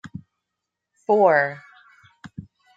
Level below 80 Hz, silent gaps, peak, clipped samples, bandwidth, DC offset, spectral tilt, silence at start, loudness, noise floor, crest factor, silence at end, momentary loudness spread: -66 dBFS; none; -4 dBFS; under 0.1%; 7.8 kHz; under 0.1%; -7.5 dB/octave; 0.05 s; -19 LUFS; -83 dBFS; 20 dB; 0.35 s; 25 LU